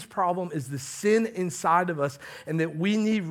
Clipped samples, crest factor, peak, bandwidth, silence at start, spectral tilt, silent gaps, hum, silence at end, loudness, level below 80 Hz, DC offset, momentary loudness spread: under 0.1%; 16 dB; -10 dBFS; 16 kHz; 0 s; -5.5 dB/octave; none; none; 0 s; -27 LUFS; -70 dBFS; under 0.1%; 9 LU